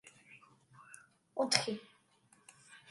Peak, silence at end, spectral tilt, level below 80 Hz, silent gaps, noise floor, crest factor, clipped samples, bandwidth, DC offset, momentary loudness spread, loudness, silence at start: -10 dBFS; 0.1 s; -2 dB/octave; -84 dBFS; none; -69 dBFS; 32 dB; under 0.1%; 11.5 kHz; under 0.1%; 27 LU; -35 LUFS; 0.05 s